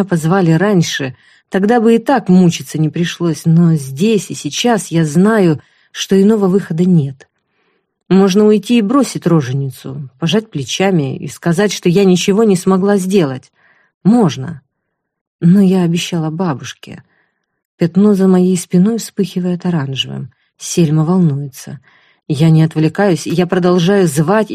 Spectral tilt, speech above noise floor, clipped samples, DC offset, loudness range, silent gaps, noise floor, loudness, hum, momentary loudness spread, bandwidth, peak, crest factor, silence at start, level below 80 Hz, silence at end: -6.5 dB/octave; 60 dB; under 0.1%; under 0.1%; 2 LU; 13.94-14.01 s, 15.21-15.39 s, 17.65-17.78 s; -72 dBFS; -13 LUFS; none; 11 LU; 14.5 kHz; 0 dBFS; 12 dB; 0 s; -54 dBFS; 0 s